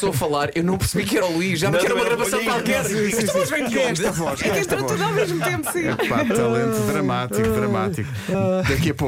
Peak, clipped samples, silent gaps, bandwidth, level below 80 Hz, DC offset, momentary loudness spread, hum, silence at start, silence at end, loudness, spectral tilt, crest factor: -8 dBFS; under 0.1%; none; 16.5 kHz; -42 dBFS; under 0.1%; 3 LU; none; 0 s; 0 s; -21 LUFS; -5 dB/octave; 12 dB